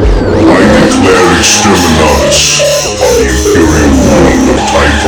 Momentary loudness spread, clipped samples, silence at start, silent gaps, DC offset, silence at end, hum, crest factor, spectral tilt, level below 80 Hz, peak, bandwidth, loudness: 3 LU; 3%; 0 s; none; under 0.1%; 0 s; none; 6 dB; -4 dB/octave; -16 dBFS; 0 dBFS; over 20 kHz; -6 LUFS